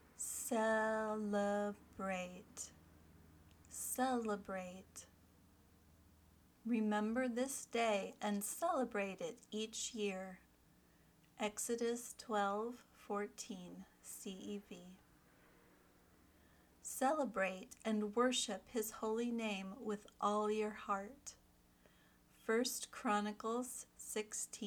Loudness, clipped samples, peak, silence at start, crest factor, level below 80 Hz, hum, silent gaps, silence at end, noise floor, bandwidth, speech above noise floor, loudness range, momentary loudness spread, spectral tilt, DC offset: -41 LUFS; under 0.1%; -24 dBFS; 0.2 s; 20 dB; -76 dBFS; none; none; 0 s; -70 dBFS; over 20 kHz; 29 dB; 6 LU; 14 LU; -3.5 dB/octave; under 0.1%